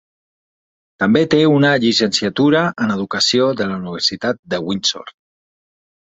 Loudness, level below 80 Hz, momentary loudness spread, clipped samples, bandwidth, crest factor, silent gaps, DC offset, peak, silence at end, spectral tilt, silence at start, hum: -16 LUFS; -56 dBFS; 9 LU; under 0.1%; 8.2 kHz; 16 dB; 4.39-4.43 s; under 0.1%; -2 dBFS; 1 s; -4.5 dB/octave; 1 s; none